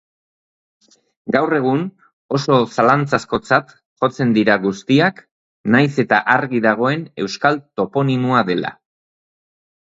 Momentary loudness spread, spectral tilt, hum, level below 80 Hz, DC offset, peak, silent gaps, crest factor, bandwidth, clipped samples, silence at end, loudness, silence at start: 8 LU; -6.5 dB/octave; none; -58 dBFS; under 0.1%; 0 dBFS; 2.13-2.29 s, 3.86-3.96 s, 5.31-5.64 s; 18 dB; 8 kHz; under 0.1%; 1.1 s; -17 LUFS; 1.25 s